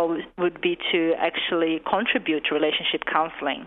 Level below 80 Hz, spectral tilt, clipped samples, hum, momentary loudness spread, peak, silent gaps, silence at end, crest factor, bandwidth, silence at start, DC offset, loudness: -60 dBFS; -8 dB/octave; under 0.1%; none; 4 LU; -6 dBFS; none; 0 s; 18 dB; 4.1 kHz; 0 s; under 0.1%; -24 LUFS